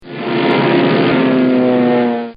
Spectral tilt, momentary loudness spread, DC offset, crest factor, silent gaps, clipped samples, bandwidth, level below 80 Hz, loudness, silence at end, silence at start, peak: -5 dB/octave; 3 LU; under 0.1%; 12 dB; none; under 0.1%; 5.2 kHz; -58 dBFS; -13 LUFS; 0.05 s; 0.05 s; 0 dBFS